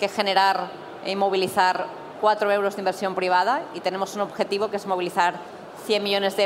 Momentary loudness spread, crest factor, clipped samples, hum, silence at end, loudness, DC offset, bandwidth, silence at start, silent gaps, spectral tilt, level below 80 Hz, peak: 9 LU; 18 dB; under 0.1%; none; 0 s; -23 LUFS; under 0.1%; 16 kHz; 0 s; none; -3.5 dB/octave; -74 dBFS; -4 dBFS